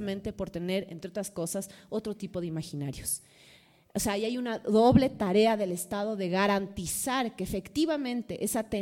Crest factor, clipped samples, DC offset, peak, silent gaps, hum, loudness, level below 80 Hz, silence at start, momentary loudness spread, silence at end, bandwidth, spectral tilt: 22 dB; under 0.1%; under 0.1%; -8 dBFS; none; none; -30 LUFS; -54 dBFS; 0 s; 12 LU; 0 s; 17 kHz; -5 dB/octave